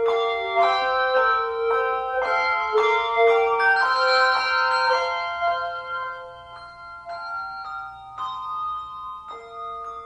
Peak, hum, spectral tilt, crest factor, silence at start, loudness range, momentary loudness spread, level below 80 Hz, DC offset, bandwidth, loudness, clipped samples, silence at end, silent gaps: -8 dBFS; none; -1.5 dB/octave; 16 dB; 0 s; 13 LU; 18 LU; -58 dBFS; under 0.1%; 10 kHz; -22 LUFS; under 0.1%; 0 s; none